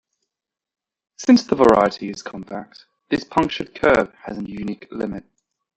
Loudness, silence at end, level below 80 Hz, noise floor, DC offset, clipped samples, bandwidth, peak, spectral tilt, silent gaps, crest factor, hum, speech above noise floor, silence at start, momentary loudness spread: -19 LUFS; 0.6 s; -50 dBFS; -86 dBFS; under 0.1%; under 0.1%; 8.4 kHz; -2 dBFS; -5.5 dB/octave; none; 20 dB; none; 66 dB; 1.2 s; 18 LU